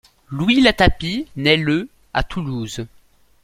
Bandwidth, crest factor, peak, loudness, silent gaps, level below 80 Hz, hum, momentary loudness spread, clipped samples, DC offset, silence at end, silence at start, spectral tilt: 15.5 kHz; 20 dB; 0 dBFS; -18 LUFS; none; -32 dBFS; none; 16 LU; under 0.1%; under 0.1%; 0.55 s; 0.3 s; -5.5 dB/octave